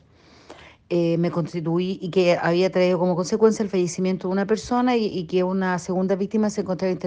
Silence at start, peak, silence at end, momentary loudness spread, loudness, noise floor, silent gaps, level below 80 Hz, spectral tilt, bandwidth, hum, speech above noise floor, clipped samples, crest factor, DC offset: 0.5 s; -6 dBFS; 0 s; 5 LU; -22 LUFS; -52 dBFS; none; -58 dBFS; -6.5 dB/octave; 9.6 kHz; none; 30 dB; under 0.1%; 16 dB; under 0.1%